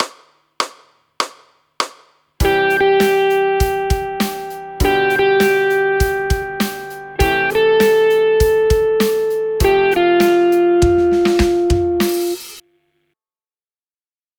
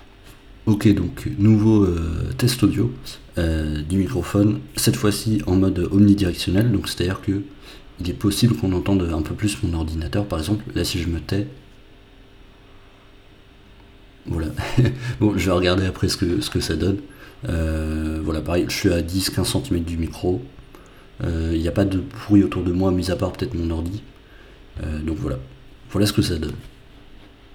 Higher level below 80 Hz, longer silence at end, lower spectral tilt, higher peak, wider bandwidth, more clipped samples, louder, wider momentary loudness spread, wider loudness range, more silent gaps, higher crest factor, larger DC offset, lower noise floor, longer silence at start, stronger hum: first, -28 dBFS vs -36 dBFS; first, 1.8 s vs 0 s; about the same, -5 dB/octave vs -6 dB/octave; first, 0 dBFS vs -4 dBFS; about the same, over 20 kHz vs 18.5 kHz; neither; first, -15 LUFS vs -21 LUFS; about the same, 11 LU vs 11 LU; second, 4 LU vs 7 LU; neither; about the same, 16 dB vs 18 dB; neither; first, under -90 dBFS vs -47 dBFS; second, 0 s vs 0.25 s; neither